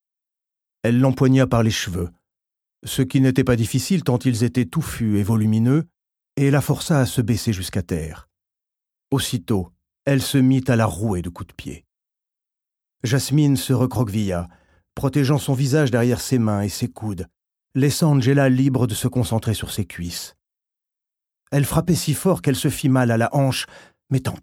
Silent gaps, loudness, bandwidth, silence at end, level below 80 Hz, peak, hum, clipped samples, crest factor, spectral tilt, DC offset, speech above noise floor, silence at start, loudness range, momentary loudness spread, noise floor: none; -20 LUFS; 16.5 kHz; 0.05 s; -46 dBFS; -4 dBFS; none; under 0.1%; 18 dB; -6 dB/octave; under 0.1%; 68 dB; 0.85 s; 4 LU; 12 LU; -87 dBFS